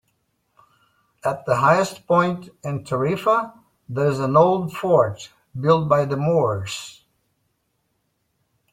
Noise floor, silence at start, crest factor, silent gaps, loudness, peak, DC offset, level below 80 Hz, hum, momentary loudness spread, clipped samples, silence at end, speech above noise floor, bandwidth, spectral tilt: -71 dBFS; 1.25 s; 20 dB; none; -20 LUFS; -2 dBFS; under 0.1%; -60 dBFS; none; 14 LU; under 0.1%; 1.8 s; 51 dB; 16 kHz; -6.5 dB/octave